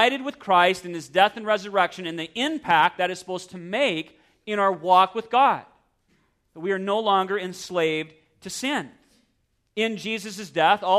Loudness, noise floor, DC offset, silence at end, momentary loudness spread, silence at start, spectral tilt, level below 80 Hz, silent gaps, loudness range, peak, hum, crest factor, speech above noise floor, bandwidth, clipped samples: -23 LUFS; -70 dBFS; under 0.1%; 0 s; 14 LU; 0 s; -3.5 dB/octave; -68 dBFS; none; 5 LU; -4 dBFS; none; 20 dB; 47 dB; 14 kHz; under 0.1%